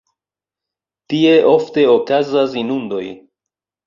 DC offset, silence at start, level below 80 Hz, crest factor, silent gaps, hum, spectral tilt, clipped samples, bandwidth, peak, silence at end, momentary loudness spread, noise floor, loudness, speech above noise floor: under 0.1%; 1.1 s; -62 dBFS; 14 dB; none; none; -6.5 dB/octave; under 0.1%; 7.2 kHz; -2 dBFS; 0.7 s; 13 LU; -88 dBFS; -15 LUFS; 74 dB